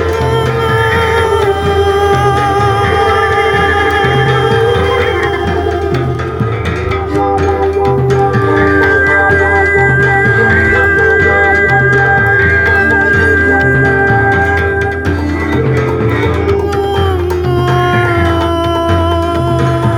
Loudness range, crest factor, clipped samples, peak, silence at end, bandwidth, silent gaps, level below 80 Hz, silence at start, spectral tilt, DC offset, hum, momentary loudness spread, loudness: 5 LU; 10 dB; under 0.1%; 0 dBFS; 0 s; 16.5 kHz; none; -26 dBFS; 0 s; -6.5 dB/octave; under 0.1%; none; 6 LU; -10 LUFS